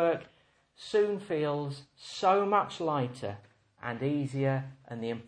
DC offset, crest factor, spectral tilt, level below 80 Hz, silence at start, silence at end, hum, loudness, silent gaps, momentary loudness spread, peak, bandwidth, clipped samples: under 0.1%; 18 dB; -6.5 dB/octave; -72 dBFS; 0 s; 0.05 s; none; -31 LUFS; none; 16 LU; -14 dBFS; 10 kHz; under 0.1%